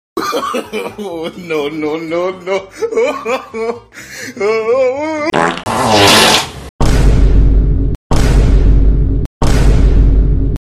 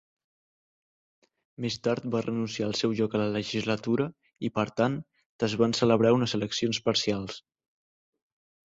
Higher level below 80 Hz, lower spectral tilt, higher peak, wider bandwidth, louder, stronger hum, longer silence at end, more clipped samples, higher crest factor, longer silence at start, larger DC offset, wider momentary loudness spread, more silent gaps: first, -14 dBFS vs -62 dBFS; about the same, -4.5 dB/octave vs -5.5 dB/octave; first, 0 dBFS vs -10 dBFS; first, 15 kHz vs 8 kHz; first, -13 LUFS vs -28 LUFS; neither; second, 0.05 s vs 1.25 s; neither; second, 12 dB vs 20 dB; second, 0.15 s vs 1.6 s; neither; about the same, 12 LU vs 11 LU; first, 6.69-6.79 s, 7.95-8.10 s, 9.26-9.41 s vs 5.26-5.39 s